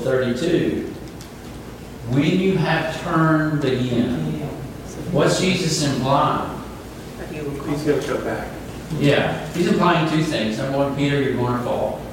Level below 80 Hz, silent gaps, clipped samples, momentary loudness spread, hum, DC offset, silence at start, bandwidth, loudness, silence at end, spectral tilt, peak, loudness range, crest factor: -42 dBFS; none; under 0.1%; 16 LU; none; under 0.1%; 0 s; 17 kHz; -20 LUFS; 0 s; -5.5 dB/octave; -2 dBFS; 3 LU; 18 dB